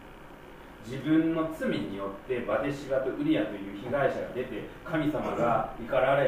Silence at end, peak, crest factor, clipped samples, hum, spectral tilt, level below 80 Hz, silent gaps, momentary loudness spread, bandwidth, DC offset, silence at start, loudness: 0 s; -14 dBFS; 16 dB; under 0.1%; none; -7 dB/octave; -52 dBFS; none; 15 LU; 15.5 kHz; under 0.1%; 0 s; -30 LUFS